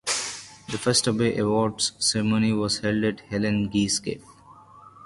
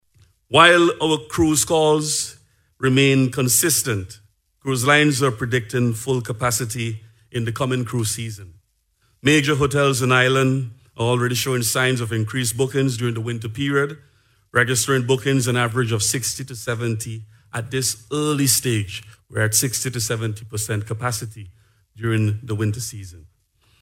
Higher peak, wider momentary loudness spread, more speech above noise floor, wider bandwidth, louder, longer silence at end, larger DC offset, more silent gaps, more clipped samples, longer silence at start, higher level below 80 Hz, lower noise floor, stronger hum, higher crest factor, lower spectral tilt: second, -6 dBFS vs 0 dBFS; about the same, 11 LU vs 13 LU; second, 26 dB vs 45 dB; second, 11.5 kHz vs 16.5 kHz; second, -24 LUFS vs -20 LUFS; second, 0 s vs 0.6 s; neither; neither; neither; second, 0.05 s vs 0.5 s; about the same, -54 dBFS vs -52 dBFS; second, -50 dBFS vs -65 dBFS; neither; about the same, 20 dB vs 20 dB; about the same, -4 dB/octave vs -4 dB/octave